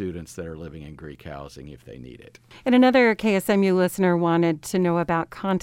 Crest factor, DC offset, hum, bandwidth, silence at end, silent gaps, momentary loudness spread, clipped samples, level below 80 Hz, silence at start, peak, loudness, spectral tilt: 18 dB; under 0.1%; none; 16.5 kHz; 0 s; none; 23 LU; under 0.1%; -52 dBFS; 0 s; -4 dBFS; -21 LUFS; -6.5 dB/octave